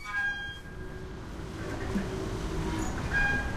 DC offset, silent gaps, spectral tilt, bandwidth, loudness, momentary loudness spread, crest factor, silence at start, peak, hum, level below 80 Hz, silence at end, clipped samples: under 0.1%; none; -5 dB/octave; 15.5 kHz; -33 LUFS; 14 LU; 16 dB; 0 s; -16 dBFS; none; -40 dBFS; 0 s; under 0.1%